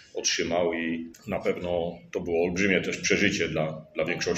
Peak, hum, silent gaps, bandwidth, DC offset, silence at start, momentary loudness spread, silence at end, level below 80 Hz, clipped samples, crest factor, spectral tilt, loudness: -6 dBFS; none; none; 14.5 kHz; under 0.1%; 0.15 s; 9 LU; 0 s; -56 dBFS; under 0.1%; 22 dB; -3.5 dB/octave; -27 LUFS